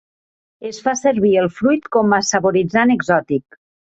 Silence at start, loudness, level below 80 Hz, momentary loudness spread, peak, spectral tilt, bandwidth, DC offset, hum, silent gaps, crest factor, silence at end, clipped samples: 0.6 s; -16 LUFS; -56 dBFS; 9 LU; -2 dBFS; -4.5 dB/octave; 8.2 kHz; under 0.1%; none; none; 16 dB; 0.55 s; under 0.1%